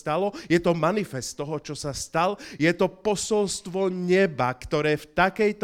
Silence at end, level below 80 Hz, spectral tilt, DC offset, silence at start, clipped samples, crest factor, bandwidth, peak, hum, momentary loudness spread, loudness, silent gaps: 0 s; -52 dBFS; -5 dB/octave; under 0.1%; 0.05 s; under 0.1%; 18 dB; 16 kHz; -6 dBFS; none; 9 LU; -25 LUFS; none